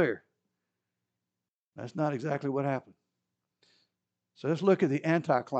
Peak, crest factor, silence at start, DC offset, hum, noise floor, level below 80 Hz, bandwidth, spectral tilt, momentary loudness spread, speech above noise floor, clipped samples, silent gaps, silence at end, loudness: -12 dBFS; 20 dB; 0 s; under 0.1%; none; under -90 dBFS; -84 dBFS; 8.4 kHz; -8 dB/octave; 14 LU; over 61 dB; under 0.1%; 1.50-1.72 s; 0 s; -30 LUFS